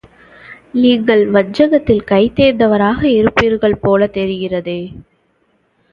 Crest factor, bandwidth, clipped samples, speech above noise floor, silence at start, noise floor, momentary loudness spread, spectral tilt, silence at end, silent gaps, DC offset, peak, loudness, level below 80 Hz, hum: 14 dB; 7.2 kHz; under 0.1%; 47 dB; 0.5 s; -59 dBFS; 9 LU; -7.5 dB/octave; 0.9 s; none; under 0.1%; 0 dBFS; -13 LUFS; -40 dBFS; none